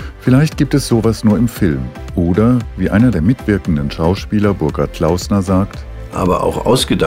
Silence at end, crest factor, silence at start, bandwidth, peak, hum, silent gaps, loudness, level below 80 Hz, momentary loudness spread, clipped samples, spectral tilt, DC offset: 0 s; 14 dB; 0 s; 16 kHz; 0 dBFS; none; none; -15 LUFS; -28 dBFS; 6 LU; under 0.1%; -6.5 dB/octave; under 0.1%